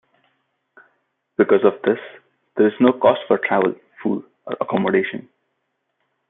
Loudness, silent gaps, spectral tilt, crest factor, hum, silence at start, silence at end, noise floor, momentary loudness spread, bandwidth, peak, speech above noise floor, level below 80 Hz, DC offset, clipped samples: -19 LUFS; none; -10.5 dB/octave; 20 dB; none; 1.4 s; 1.1 s; -73 dBFS; 15 LU; 4 kHz; -2 dBFS; 56 dB; -68 dBFS; under 0.1%; under 0.1%